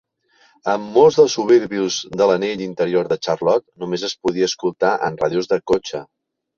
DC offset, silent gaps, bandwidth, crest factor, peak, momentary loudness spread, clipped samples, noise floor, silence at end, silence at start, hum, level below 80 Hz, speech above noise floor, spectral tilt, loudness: under 0.1%; none; 7.4 kHz; 18 dB; -2 dBFS; 10 LU; under 0.1%; -57 dBFS; 0.55 s; 0.65 s; none; -56 dBFS; 39 dB; -4.5 dB/octave; -18 LUFS